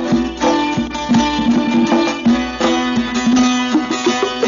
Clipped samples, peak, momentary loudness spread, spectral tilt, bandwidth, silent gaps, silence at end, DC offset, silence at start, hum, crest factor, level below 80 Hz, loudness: under 0.1%; -4 dBFS; 3 LU; -4.5 dB/octave; 7.4 kHz; none; 0 s; under 0.1%; 0 s; none; 12 dB; -38 dBFS; -15 LUFS